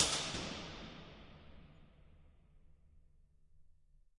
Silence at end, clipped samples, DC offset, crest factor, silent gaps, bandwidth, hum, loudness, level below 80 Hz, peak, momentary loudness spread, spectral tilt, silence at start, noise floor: 0.45 s; under 0.1%; under 0.1%; 34 dB; none; 11.5 kHz; none; -40 LUFS; -62 dBFS; -12 dBFS; 24 LU; -1.5 dB/octave; 0 s; -66 dBFS